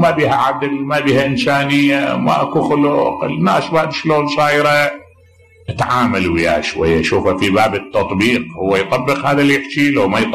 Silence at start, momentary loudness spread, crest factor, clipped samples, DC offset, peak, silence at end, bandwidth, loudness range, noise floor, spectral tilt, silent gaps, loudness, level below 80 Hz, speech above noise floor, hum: 0 s; 5 LU; 10 dB; under 0.1%; 0.3%; -4 dBFS; 0 s; 13.5 kHz; 1 LU; -47 dBFS; -5.5 dB/octave; none; -14 LUFS; -42 dBFS; 33 dB; none